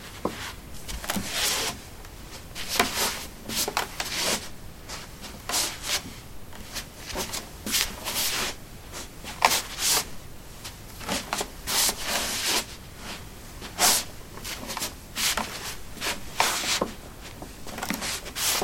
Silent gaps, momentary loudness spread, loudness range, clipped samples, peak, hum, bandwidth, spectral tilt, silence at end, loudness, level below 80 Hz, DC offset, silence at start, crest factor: none; 18 LU; 4 LU; under 0.1%; -2 dBFS; none; 16.5 kHz; -1 dB/octave; 0 s; -27 LUFS; -46 dBFS; under 0.1%; 0 s; 28 dB